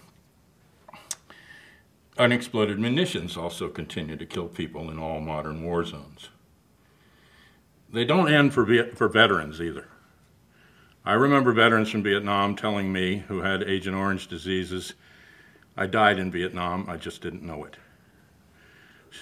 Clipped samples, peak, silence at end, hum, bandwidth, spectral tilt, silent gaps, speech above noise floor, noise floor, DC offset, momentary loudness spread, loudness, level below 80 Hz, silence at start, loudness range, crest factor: under 0.1%; -2 dBFS; 0 s; none; 15 kHz; -5.5 dB/octave; none; 36 dB; -60 dBFS; under 0.1%; 18 LU; -25 LUFS; -56 dBFS; 0.95 s; 10 LU; 24 dB